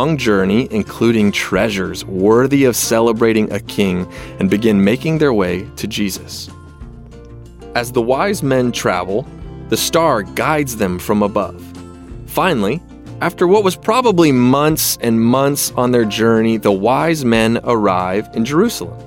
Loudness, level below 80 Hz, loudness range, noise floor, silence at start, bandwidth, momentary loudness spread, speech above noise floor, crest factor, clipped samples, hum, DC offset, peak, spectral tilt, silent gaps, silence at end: -15 LUFS; -40 dBFS; 6 LU; -35 dBFS; 0 s; 17 kHz; 10 LU; 21 dB; 14 dB; under 0.1%; none; under 0.1%; 0 dBFS; -5 dB/octave; none; 0 s